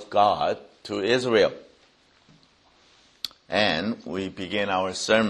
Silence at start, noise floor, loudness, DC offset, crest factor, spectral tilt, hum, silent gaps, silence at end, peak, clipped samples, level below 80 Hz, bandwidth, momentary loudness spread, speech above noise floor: 0 s; -60 dBFS; -25 LUFS; under 0.1%; 22 dB; -4 dB/octave; none; none; 0 s; -4 dBFS; under 0.1%; -60 dBFS; 11.5 kHz; 14 LU; 36 dB